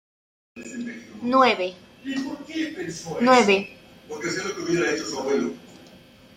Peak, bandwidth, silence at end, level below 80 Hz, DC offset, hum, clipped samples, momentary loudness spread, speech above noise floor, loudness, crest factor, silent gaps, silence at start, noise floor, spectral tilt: -4 dBFS; 15.5 kHz; 0.4 s; -64 dBFS; under 0.1%; none; under 0.1%; 20 LU; 27 dB; -23 LUFS; 20 dB; none; 0.55 s; -50 dBFS; -4 dB/octave